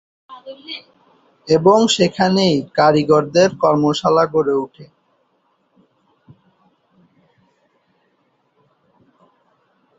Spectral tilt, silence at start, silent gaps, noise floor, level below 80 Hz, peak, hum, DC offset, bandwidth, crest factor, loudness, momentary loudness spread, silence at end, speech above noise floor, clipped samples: -5 dB/octave; 0.3 s; none; -64 dBFS; -58 dBFS; -2 dBFS; none; under 0.1%; 8 kHz; 18 dB; -15 LUFS; 20 LU; 5.15 s; 48 dB; under 0.1%